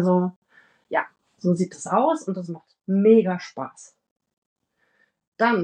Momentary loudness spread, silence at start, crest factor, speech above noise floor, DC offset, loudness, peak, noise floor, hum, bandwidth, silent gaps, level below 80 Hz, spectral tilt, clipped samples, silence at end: 19 LU; 0 s; 18 dB; 45 dB; under 0.1%; -22 LUFS; -6 dBFS; -67 dBFS; none; 9.8 kHz; 0.36-0.42 s, 4.11-4.16 s, 4.38-4.56 s, 5.27-5.32 s; -80 dBFS; -7 dB/octave; under 0.1%; 0 s